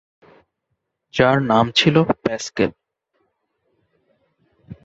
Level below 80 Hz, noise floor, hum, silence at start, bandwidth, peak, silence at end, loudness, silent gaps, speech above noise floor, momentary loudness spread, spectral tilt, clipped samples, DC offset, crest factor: -54 dBFS; -75 dBFS; none; 1.15 s; 8 kHz; -2 dBFS; 0.1 s; -18 LUFS; none; 58 dB; 9 LU; -5.5 dB/octave; under 0.1%; under 0.1%; 20 dB